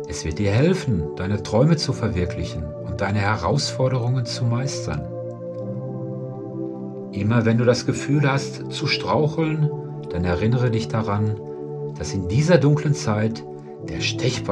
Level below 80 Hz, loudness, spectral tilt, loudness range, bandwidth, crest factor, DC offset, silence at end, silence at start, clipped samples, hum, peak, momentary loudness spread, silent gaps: -44 dBFS; -22 LUFS; -6 dB/octave; 4 LU; 10.5 kHz; 20 dB; under 0.1%; 0 s; 0 s; under 0.1%; none; -2 dBFS; 12 LU; none